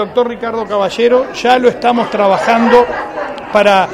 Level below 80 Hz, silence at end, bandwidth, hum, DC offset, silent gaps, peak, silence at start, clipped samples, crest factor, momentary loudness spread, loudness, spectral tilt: -46 dBFS; 0 s; 12 kHz; none; under 0.1%; none; 0 dBFS; 0 s; 0.3%; 12 dB; 9 LU; -12 LUFS; -5 dB/octave